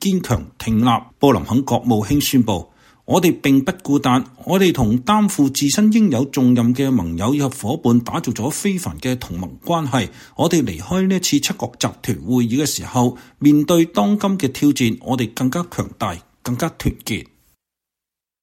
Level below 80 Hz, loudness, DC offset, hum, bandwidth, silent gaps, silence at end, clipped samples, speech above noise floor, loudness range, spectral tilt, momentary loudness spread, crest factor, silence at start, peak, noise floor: -42 dBFS; -18 LUFS; under 0.1%; none; 16.5 kHz; none; 1.2 s; under 0.1%; 69 dB; 5 LU; -5.5 dB/octave; 9 LU; 16 dB; 0 s; -2 dBFS; -87 dBFS